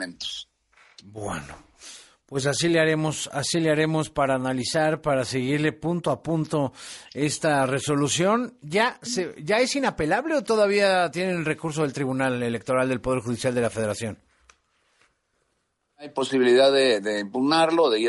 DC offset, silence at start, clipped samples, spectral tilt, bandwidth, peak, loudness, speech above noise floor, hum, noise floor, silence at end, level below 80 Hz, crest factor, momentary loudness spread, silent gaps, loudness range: under 0.1%; 0 s; under 0.1%; -4.5 dB/octave; 11.5 kHz; -8 dBFS; -24 LUFS; 50 dB; none; -74 dBFS; 0 s; -56 dBFS; 16 dB; 13 LU; none; 4 LU